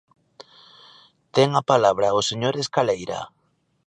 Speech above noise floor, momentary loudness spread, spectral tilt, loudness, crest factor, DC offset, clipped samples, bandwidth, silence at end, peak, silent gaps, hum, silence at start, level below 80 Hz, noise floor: 32 dB; 13 LU; -4.5 dB/octave; -21 LUFS; 20 dB; under 0.1%; under 0.1%; 10.5 kHz; 0.6 s; -2 dBFS; none; none; 1.35 s; -62 dBFS; -53 dBFS